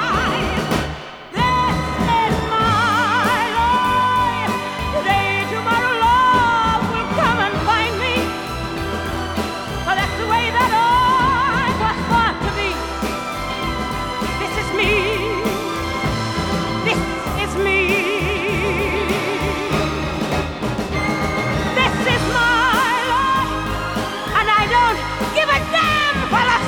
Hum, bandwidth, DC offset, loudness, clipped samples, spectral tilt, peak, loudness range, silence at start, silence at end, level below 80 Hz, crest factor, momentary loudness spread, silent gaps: none; over 20 kHz; under 0.1%; -18 LUFS; under 0.1%; -4.5 dB/octave; -2 dBFS; 4 LU; 0 s; 0 s; -34 dBFS; 16 dB; 8 LU; none